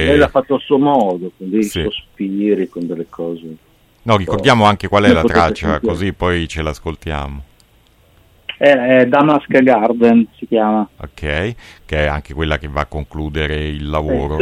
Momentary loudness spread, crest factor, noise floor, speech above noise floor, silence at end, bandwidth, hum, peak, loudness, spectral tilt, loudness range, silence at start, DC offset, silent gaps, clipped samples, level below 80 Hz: 14 LU; 16 dB; -51 dBFS; 36 dB; 0 s; 14.5 kHz; none; 0 dBFS; -15 LUFS; -6.5 dB/octave; 7 LU; 0 s; under 0.1%; none; under 0.1%; -32 dBFS